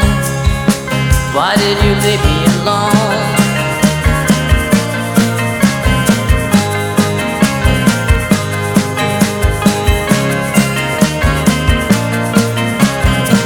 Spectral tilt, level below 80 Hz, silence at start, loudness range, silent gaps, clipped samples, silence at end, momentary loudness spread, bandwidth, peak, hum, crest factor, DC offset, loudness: -5 dB/octave; -20 dBFS; 0 s; 1 LU; none; under 0.1%; 0 s; 3 LU; 19.5 kHz; 0 dBFS; none; 12 dB; under 0.1%; -12 LUFS